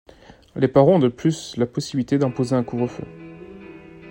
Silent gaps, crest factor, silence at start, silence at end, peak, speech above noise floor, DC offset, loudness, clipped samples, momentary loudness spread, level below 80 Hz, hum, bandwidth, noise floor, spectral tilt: none; 20 dB; 0.55 s; 0 s; -2 dBFS; 21 dB; under 0.1%; -21 LUFS; under 0.1%; 24 LU; -54 dBFS; none; 16 kHz; -41 dBFS; -7 dB/octave